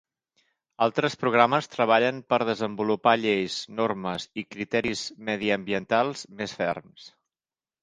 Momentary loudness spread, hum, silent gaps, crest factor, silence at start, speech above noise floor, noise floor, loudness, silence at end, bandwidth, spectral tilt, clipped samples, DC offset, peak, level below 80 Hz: 10 LU; none; none; 24 dB; 0.8 s; over 64 dB; under -90 dBFS; -26 LUFS; 0.75 s; 10 kHz; -4.5 dB/octave; under 0.1%; under 0.1%; -2 dBFS; -64 dBFS